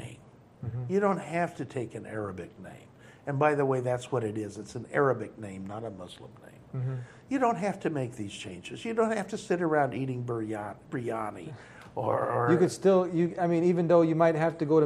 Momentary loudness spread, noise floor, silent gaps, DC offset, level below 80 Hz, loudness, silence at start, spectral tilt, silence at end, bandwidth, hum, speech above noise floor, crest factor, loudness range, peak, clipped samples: 17 LU; -53 dBFS; none; under 0.1%; -66 dBFS; -29 LUFS; 0 s; -7 dB/octave; 0 s; 12.5 kHz; none; 24 dB; 20 dB; 7 LU; -10 dBFS; under 0.1%